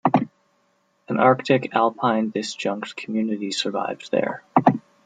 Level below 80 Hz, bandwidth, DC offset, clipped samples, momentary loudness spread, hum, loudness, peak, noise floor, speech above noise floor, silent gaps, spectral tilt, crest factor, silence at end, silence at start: -70 dBFS; 9.4 kHz; under 0.1%; under 0.1%; 9 LU; none; -22 LUFS; -2 dBFS; -66 dBFS; 44 dB; none; -5.5 dB/octave; 20 dB; 0.25 s; 0.05 s